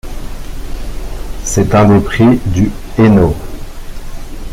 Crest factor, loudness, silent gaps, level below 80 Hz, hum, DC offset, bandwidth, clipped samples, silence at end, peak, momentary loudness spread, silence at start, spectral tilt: 12 dB; -11 LUFS; none; -22 dBFS; none; under 0.1%; 16 kHz; under 0.1%; 0 s; 0 dBFS; 22 LU; 0.05 s; -6.5 dB/octave